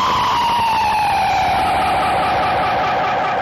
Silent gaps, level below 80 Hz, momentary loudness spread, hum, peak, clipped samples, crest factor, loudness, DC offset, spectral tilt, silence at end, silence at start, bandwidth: none; -40 dBFS; 1 LU; none; -8 dBFS; under 0.1%; 8 dB; -16 LUFS; under 0.1%; -4 dB/octave; 0 s; 0 s; 15.5 kHz